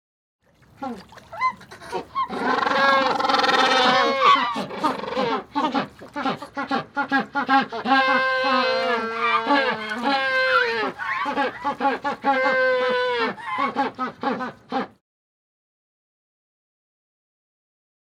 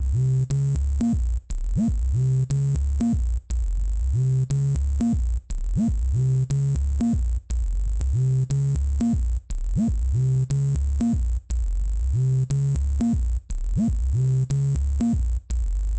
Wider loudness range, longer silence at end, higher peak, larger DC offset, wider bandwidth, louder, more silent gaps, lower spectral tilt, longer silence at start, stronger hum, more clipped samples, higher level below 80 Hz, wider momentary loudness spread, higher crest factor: first, 10 LU vs 1 LU; first, 3.35 s vs 0 s; first, -4 dBFS vs -14 dBFS; neither; first, 14.5 kHz vs 8.8 kHz; first, -21 LUFS vs -24 LUFS; neither; second, -3.5 dB/octave vs -8.5 dB/octave; first, 0.8 s vs 0 s; neither; neither; second, -64 dBFS vs -26 dBFS; first, 12 LU vs 6 LU; first, 20 dB vs 8 dB